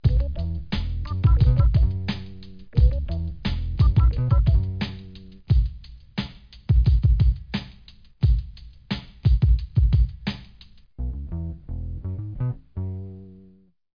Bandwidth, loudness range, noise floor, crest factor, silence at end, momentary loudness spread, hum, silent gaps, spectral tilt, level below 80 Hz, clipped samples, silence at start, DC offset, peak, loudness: 5.2 kHz; 6 LU; -55 dBFS; 14 dB; 0.5 s; 16 LU; none; none; -9 dB/octave; -24 dBFS; under 0.1%; 0 s; under 0.1%; -8 dBFS; -24 LUFS